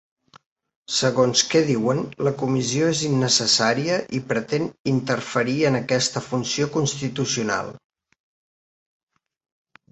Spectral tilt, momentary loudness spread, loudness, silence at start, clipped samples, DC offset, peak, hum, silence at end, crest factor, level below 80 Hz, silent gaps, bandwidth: -4 dB/octave; 8 LU; -21 LUFS; 0.9 s; under 0.1%; under 0.1%; -4 dBFS; none; 2.15 s; 18 dB; -60 dBFS; 4.79-4.85 s; 8.4 kHz